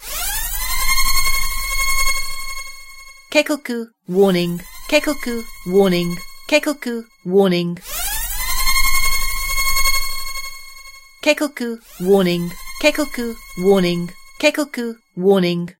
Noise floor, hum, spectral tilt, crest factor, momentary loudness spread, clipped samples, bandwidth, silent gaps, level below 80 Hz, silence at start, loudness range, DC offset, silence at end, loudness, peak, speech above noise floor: -39 dBFS; none; -3.5 dB/octave; 18 dB; 13 LU; under 0.1%; 16.5 kHz; none; -28 dBFS; 0 s; 2 LU; under 0.1%; 0.1 s; -19 LUFS; 0 dBFS; 22 dB